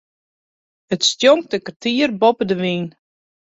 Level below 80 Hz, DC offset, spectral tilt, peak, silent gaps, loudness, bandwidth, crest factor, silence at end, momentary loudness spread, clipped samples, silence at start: -62 dBFS; under 0.1%; -4 dB/octave; -2 dBFS; 1.76-1.80 s; -17 LUFS; 8 kHz; 18 dB; 0.55 s; 11 LU; under 0.1%; 0.9 s